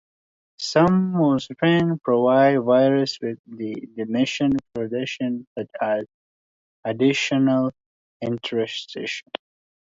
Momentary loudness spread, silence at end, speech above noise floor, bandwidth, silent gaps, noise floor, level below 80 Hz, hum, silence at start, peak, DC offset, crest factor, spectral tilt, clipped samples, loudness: 14 LU; 0.6 s; over 69 dB; 7.8 kHz; 3.39-3.44 s, 5.47-5.56 s, 6.14-6.83 s, 7.86-8.20 s; under -90 dBFS; -60 dBFS; none; 0.6 s; -4 dBFS; under 0.1%; 18 dB; -6 dB/octave; under 0.1%; -22 LUFS